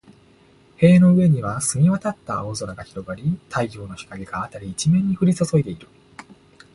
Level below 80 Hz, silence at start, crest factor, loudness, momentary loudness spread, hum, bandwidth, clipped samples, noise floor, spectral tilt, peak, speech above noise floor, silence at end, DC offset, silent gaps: -50 dBFS; 0.8 s; 18 dB; -20 LUFS; 18 LU; none; 11.5 kHz; under 0.1%; -53 dBFS; -6.5 dB/octave; -2 dBFS; 34 dB; 0.9 s; under 0.1%; none